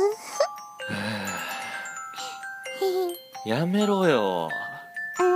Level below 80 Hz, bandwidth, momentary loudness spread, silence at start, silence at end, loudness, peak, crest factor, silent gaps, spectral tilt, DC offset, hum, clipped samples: -76 dBFS; 15.5 kHz; 13 LU; 0 s; 0 s; -28 LUFS; -8 dBFS; 20 dB; none; -5 dB/octave; under 0.1%; none; under 0.1%